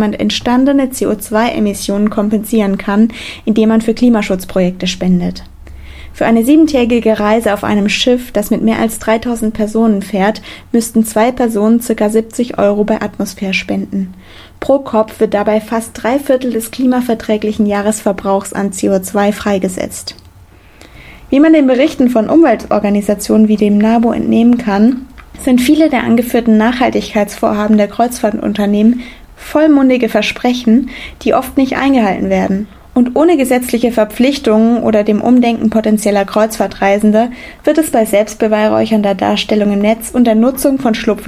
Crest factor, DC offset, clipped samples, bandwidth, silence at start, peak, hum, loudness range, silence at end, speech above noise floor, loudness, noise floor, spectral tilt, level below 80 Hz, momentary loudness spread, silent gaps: 12 dB; under 0.1%; under 0.1%; 16 kHz; 0 s; 0 dBFS; none; 4 LU; 0 s; 29 dB; -12 LUFS; -40 dBFS; -5.5 dB/octave; -38 dBFS; 7 LU; none